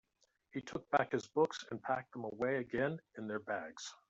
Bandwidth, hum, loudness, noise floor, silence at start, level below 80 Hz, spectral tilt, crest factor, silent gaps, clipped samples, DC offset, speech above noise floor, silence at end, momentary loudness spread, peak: 8 kHz; none; -39 LUFS; -78 dBFS; 0.55 s; -74 dBFS; -5 dB/octave; 24 dB; none; under 0.1%; under 0.1%; 39 dB; 0.15 s; 11 LU; -16 dBFS